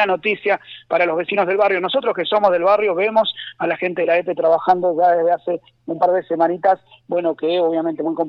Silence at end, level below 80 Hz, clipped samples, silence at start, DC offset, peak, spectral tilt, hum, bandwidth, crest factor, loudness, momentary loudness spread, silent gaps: 0 s; -66 dBFS; under 0.1%; 0 s; under 0.1%; -2 dBFS; -7 dB/octave; none; 5.8 kHz; 16 dB; -18 LUFS; 7 LU; none